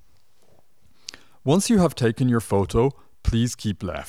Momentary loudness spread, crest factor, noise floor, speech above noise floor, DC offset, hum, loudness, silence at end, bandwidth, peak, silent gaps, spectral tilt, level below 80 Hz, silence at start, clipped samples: 21 LU; 16 dB; -63 dBFS; 42 dB; 0.4%; none; -22 LUFS; 0 s; 15.5 kHz; -8 dBFS; none; -6 dB/octave; -38 dBFS; 1.45 s; under 0.1%